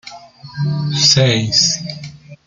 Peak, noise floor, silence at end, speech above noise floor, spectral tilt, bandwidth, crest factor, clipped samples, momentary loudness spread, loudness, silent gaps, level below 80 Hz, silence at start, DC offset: 0 dBFS; -36 dBFS; 0.1 s; 22 dB; -3.5 dB/octave; 9.4 kHz; 16 dB; under 0.1%; 22 LU; -13 LUFS; none; -50 dBFS; 0.05 s; under 0.1%